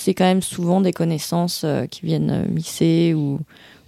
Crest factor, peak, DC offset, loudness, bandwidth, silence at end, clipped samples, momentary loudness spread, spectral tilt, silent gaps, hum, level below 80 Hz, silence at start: 16 dB; -4 dBFS; under 0.1%; -20 LUFS; 15.5 kHz; 0.45 s; under 0.1%; 7 LU; -6 dB/octave; none; none; -54 dBFS; 0 s